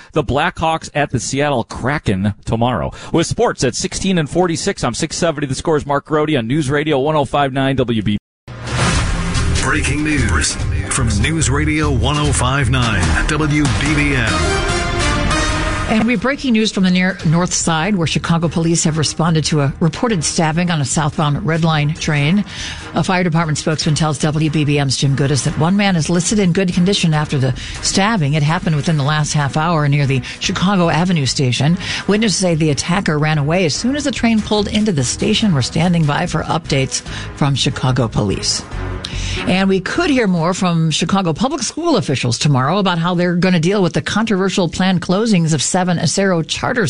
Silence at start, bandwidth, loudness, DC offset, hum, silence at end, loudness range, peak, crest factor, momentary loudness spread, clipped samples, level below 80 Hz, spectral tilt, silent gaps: 0 s; 11 kHz; -16 LUFS; under 0.1%; none; 0 s; 2 LU; -4 dBFS; 12 dB; 4 LU; under 0.1%; -30 dBFS; -5 dB/octave; 8.20-8.47 s